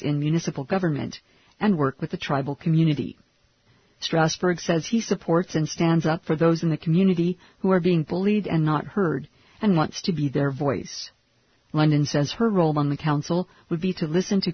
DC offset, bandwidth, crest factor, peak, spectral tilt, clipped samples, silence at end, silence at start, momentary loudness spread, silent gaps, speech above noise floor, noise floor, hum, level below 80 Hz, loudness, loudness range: under 0.1%; 6.6 kHz; 16 dB; -8 dBFS; -6.5 dB/octave; under 0.1%; 0 s; 0 s; 8 LU; none; 41 dB; -64 dBFS; none; -58 dBFS; -24 LUFS; 3 LU